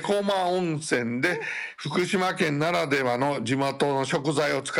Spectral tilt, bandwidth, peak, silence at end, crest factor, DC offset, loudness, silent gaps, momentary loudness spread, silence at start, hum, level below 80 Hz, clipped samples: -5 dB/octave; 16.5 kHz; -14 dBFS; 0 s; 12 dB; under 0.1%; -25 LUFS; none; 4 LU; 0 s; none; -68 dBFS; under 0.1%